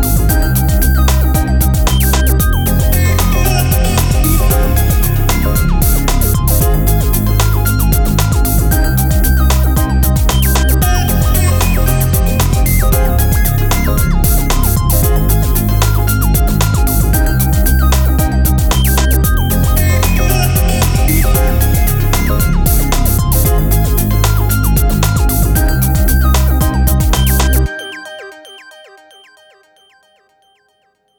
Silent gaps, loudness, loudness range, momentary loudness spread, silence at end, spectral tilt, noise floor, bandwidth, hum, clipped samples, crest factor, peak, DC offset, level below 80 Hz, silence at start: none; -12 LUFS; 1 LU; 2 LU; 2.6 s; -5 dB/octave; -58 dBFS; over 20 kHz; none; under 0.1%; 10 dB; 0 dBFS; under 0.1%; -12 dBFS; 0 s